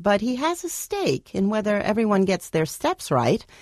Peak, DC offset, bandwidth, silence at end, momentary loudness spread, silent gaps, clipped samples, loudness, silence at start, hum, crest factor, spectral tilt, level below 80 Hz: -8 dBFS; under 0.1%; 13.5 kHz; 0.2 s; 5 LU; none; under 0.1%; -23 LUFS; 0 s; none; 14 dB; -5 dB/octave; -54 dBFS